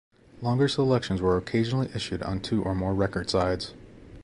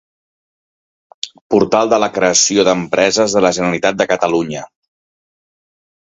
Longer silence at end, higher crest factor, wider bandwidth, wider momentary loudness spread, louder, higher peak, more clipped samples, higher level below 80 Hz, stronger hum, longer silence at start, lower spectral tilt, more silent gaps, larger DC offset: second, 0 s vs 1.5 s; about the same, 18 dB vs 16 dB; first, 11.5 kHz vs 8.4 kHz; second, 7 LU vs 14 LU; second, -27 LUFS vs -14 LUFS; second, -10 dBFS vs 0 dBFS; neither; first, -46 dBFS vs -52 dBFS; neither; second, 0.35 s vs 1.25 s; first, -6.5 dB/octave vs -3 dB/octave; second, none vs 1.41-1.50 s; neither